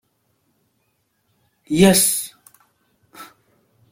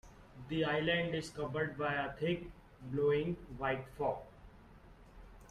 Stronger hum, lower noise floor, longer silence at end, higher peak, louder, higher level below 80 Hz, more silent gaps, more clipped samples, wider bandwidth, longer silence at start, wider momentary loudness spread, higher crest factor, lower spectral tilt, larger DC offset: neither; first, -68 dBFS vs -58 dBFS; first, 0.65 s vs 0 s; first, -2 dBFS vs -22 dBFS; first, -15 LUFS vs -37 LUFS; first, -52 dBFS vs -58 dBFS; neither; neither; first, 16.5 kHz vs 12.5 kHz; first, 1.7 s vs 0.05 s; first, 29 LU vs 19 LU; about the same, 20 dB vs 16 dB; second, -4 dB/octave vs -6 dB/octave; neither